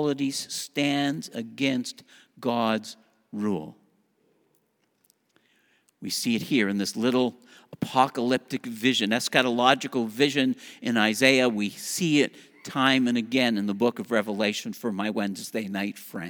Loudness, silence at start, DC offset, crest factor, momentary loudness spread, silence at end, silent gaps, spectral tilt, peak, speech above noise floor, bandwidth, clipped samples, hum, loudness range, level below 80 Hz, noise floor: -25 LUFS; 0 s; under 0.1%; 24 dB; 11 LU; 0 s; none; -4 dB/octave; -2 dBFS; 45 dB; over 20 kHz; under 0.1%; none; 9 LU; -74 dBFS; -70 dBFS